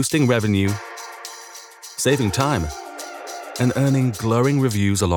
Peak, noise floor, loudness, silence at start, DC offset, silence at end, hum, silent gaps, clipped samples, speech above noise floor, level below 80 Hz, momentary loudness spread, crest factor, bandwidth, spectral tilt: -2 dBFS; -40 dBFS; -20 LUFS; 0 s; under 0.1%; 0 s; none; none; under 0.1%; 21 dB; -46 dBFS; 16 LU; 18 dB; 18.5 kHz; -5.5 dB/octave